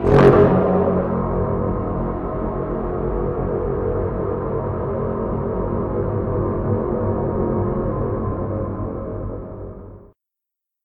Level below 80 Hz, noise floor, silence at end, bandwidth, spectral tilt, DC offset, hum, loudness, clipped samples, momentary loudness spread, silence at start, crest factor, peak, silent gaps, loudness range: -32 dBFS; -83 dBFS; 0.8 s; 6.4 kHz; -10 dB/octave; under 0.1%; none; -21 LUFS; under 0.1%; 11 LU; 0 s; 18 dB; -2 dBFS; none; 4 LU